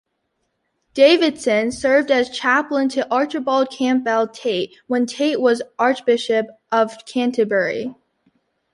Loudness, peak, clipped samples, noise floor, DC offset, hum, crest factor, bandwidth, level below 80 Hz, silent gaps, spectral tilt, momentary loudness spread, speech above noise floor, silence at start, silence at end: -19 LUFS; -2 dBFS; under 0.1%; -72 dBFS; under 0.1%; none; 18 dB; 11.5 kHz; -62 dBFS; none; -4 dB/octave; 7 LU; 54 dB; 0.95 s; 0.8 s